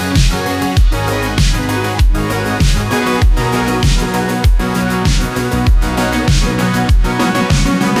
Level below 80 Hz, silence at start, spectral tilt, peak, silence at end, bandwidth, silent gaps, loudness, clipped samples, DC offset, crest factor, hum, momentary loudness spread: -16 dBFS; 0 s; -5 dB/octave; 0 dBFS; 0 s; 16 kHz; none; -14 LUFS; under 0.1%; under 0.1%; 12 dB; none; 3 LU